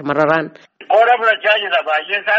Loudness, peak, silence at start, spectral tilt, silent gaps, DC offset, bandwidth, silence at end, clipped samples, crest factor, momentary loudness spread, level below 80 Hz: -14 LUFS; 0 dBFS; 0 s; -1 dB/octave; none; under 0.1%; 7.8 kHz; 0 s; under 0.1%; 16 dB; 5 LU; -66 dBFS